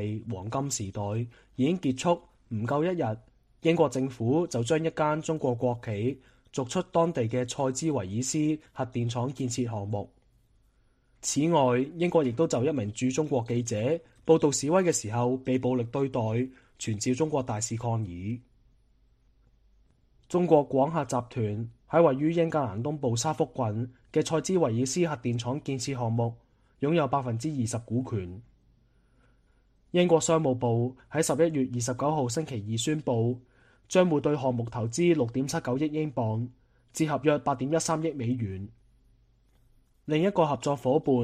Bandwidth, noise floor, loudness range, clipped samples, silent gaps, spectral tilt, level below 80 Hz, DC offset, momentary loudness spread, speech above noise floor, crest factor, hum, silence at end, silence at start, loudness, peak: 14.5 kHz; -65 dBFS; 4 LU; under 0.1%; none; -6 dB/octave; -62 dBFS; under 0.1%; 10 LU; 38 dB; 22 dB; none; 0 s; 0 s; -28 LUFS; -8 dBFS